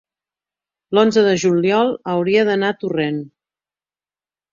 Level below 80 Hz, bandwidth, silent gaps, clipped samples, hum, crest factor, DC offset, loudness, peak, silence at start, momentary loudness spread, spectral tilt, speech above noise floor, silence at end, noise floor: -62 dBFS; 7.6 kHz; none; under 0.1%; none; 16 dB; under 0.1%; -17 LUFS; -2 dBFS; 0.9 s; 7 LU; -5.5 dB/octave; over 74 dB; 1.25 s; under -90 dBFS